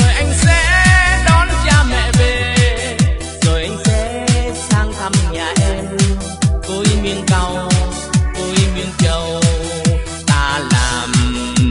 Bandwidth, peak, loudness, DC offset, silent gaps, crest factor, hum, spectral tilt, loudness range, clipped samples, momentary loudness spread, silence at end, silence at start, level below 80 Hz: 11.5 kHz; 0 dBFS; -14 LUFS; under 0.1%; none; 14 dB; none; -4.5 dB/octave; 4 LU; under 0.1%; 6 LU; 0 s; 0 s; -20 dBFS